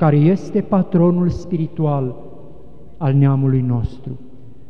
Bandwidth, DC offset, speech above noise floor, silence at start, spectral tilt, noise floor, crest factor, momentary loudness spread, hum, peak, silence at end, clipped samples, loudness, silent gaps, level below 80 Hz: 6.4 kHz; 2%; 26 dB; 0 s; -10.5 dB/octave; -42 dBFS; 14 dB; 15 LU; none; -4 dBFS; 0.45 s; under 0.1%; -18 LUFS; none; -40 dBFS